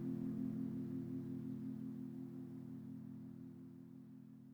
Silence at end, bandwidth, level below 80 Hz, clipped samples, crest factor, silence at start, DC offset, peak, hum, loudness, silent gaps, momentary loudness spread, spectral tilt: 0 s; over 20 kHz; -80 dBFS; under 0.1%; 14 dB; 0 s; under 0.1%; -34 dBFS; none; -48 LUFS; none; 14 LU; -10 dB/octave